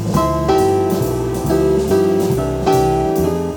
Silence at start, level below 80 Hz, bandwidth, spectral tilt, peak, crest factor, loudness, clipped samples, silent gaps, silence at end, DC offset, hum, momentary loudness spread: 0 s; -30 dBFS; over 20 kHz; -6.5 dB/octave; -2 dBFS; 12 dB; -16 LUFS; under 0.1%; none; 0 s; under 0.1%; none; 3 LU